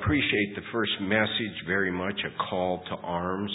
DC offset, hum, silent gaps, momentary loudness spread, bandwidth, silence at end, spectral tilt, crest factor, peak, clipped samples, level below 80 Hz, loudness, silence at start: under 0.1%; none; none; 6 LU; 4 kHz; 0 s; -9.5 dB/octave; 20 dB; -8 dBFS; under 0.1%; -48 dBFS; -28 LUFS; 0 s